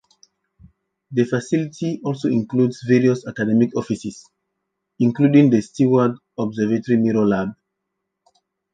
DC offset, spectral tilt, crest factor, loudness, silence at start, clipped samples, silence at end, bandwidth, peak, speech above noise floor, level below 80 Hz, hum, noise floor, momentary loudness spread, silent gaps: under 0.1%; -7.5 dB/octave; 18 dB; -19 LUFS; 1.1 s; under 0.1%; 1.2 s; 9.2 kHz; -4 dBFS; 60 dB; -60 dBFS; none; -78 dBFS; 11 LU; none